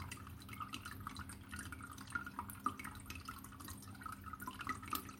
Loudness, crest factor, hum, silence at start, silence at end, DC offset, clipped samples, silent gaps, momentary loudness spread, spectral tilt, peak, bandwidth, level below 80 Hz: -48 LUFS; 26 dB; none; 0 s; 0 s; under 0.1%; under 0.1%; none; 7 LU; -3.5 dB/octave; -22 dBFS; 16.5 kHz; -62 dBFS